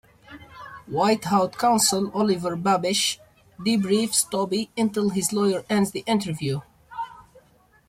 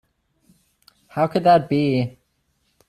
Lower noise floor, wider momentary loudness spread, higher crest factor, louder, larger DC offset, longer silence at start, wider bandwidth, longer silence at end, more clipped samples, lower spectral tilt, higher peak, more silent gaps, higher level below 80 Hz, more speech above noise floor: second, -58 dBFS vs -68 dBFS; about the same, 15 LU vs 13 LU; about the same, 18 dB vs 18 dB; second, -23 LUFS vs -19 LUFS; neither; second, 0.3 s vs 1.15 s; first, 16 kHz vs 13 kHz; second, 0.65 s vs 0.8 s; neither; second, -4 dB/octave vs -8 dB/octave; about the same, -6 dBFS vs -4 dBFS; neither; about the same, -60 dBFS vs -60 dBFS; second, 35 dB vs 50 dB